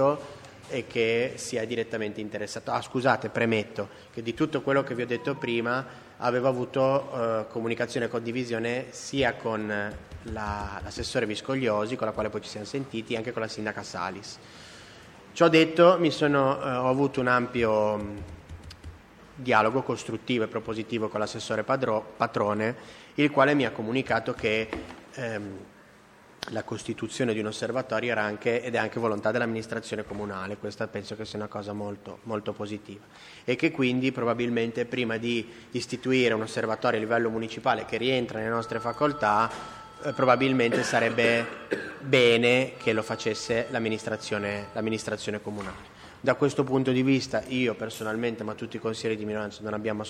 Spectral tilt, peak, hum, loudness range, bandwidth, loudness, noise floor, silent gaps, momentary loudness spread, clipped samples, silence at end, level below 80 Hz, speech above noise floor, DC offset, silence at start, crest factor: -5 dB/octave; -4 dBFS; none; 7 LU; 14 kHz; -27 LUFS; -54 dBFS; none; 13 LU; under 0.1%; 0 s; -56 dBFS; 26 dB; under 0.1%; 0 s; 22 dB